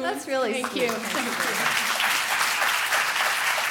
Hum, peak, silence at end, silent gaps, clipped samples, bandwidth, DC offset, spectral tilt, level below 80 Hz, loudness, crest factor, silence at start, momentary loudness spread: none; -8 dBFS; 0 s; none; under 0.1%; 17.5 kHz; under 0.1%; -0.5 dB/octave; -72 dBFS; -23 LUFS; 16 dB; 0 s; 5 LU